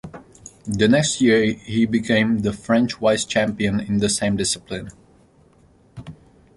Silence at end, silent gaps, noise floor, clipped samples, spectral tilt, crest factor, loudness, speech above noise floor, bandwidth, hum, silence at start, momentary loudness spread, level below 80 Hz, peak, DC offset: 0.45 s; none; -54 dBFS; under 0.1%; -4.5 dB/octave; 18 dB; -20 LUFS; 35 dB; 11.5 kHz; none; 0.05 s; 23 LU; -48 dBFS; -4 dBFS; under 0.1%